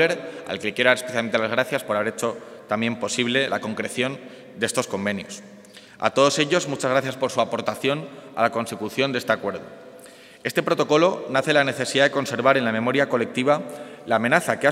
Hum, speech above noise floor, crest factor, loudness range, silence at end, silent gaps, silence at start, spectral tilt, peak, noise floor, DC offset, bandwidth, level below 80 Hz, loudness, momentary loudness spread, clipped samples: none; 23 dB; 22 dB; 5 LU; 0 s; none; 0 s; -4 dB/octave; 0 dBFS; -45 dBFS; under 0.1%; 16 kHz; -72 dBFS; -22 LUFS; 12 LU; under 0.1%